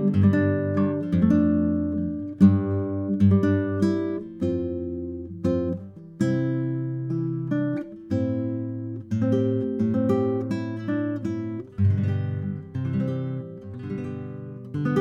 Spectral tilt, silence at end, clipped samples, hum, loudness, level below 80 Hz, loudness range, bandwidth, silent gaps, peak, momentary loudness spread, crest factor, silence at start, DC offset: -10 dB/octave; 0 s; under 0.1%; none; -25 LUFS; -52 dBFS; 6 LU; 7.8 kHz; none; -6 dBFS; 13 LU; 18 dB; 0 s; under 0.1%